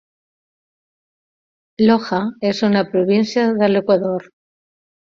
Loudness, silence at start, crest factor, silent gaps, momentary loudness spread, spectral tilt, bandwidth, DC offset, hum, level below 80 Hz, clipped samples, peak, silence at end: -17 LUFS; 1.8 s; 16 dB; none; 6 LU; -6.5 dB/octave; 7.2 kHz; under 0.1%; none; -60 dBFS; under 0.1%; -2 dBFS; 0.8 s